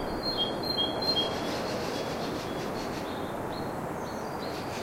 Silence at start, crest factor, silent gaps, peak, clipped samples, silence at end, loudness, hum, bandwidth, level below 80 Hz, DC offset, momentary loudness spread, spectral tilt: 0 s; 16 dB; none; -16 dBFS; under 0.1%; 0 s; -31 LUFS; none; 16 kHz; -52 dBFS; under 0.1%; 8 LU; -4 dB/octave